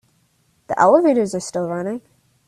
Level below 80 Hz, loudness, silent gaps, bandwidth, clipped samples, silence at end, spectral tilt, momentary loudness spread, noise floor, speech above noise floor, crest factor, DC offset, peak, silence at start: -62 dBFS; -18 LUFS; none; 13 kHz; under 0.1%; 0.5 s; -6 dB/octave; 15 LU; -62 dBFS; 45 dB; 18 dB; under 0.1%; -2 dBFS; 0.7 s